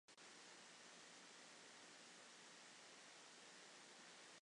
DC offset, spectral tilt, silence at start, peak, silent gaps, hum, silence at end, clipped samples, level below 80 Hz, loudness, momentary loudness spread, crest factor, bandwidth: under 0.1%; -0.5 dB/octave; 0.1 s; -50 dBFS; none; none; 0 s; under 0.1%; under -90 dBFS; -61 LUFS; 0 LU; 14 dB; 11 kHz